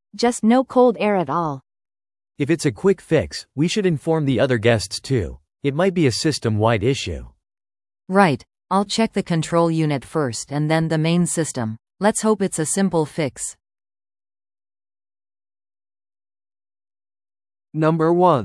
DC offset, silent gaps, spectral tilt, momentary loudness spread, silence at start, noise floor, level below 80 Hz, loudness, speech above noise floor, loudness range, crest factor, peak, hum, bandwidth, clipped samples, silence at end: under 0.1%; none; -5.5 dB/octave; 10 LU; 0.15 s; under -90 dBFS; -50 dBFS; -20 LUFS; over 71 dB; 6 LU; 20 dB; 0 dBFS; none; 12 kHz; under 0.1%; 0 s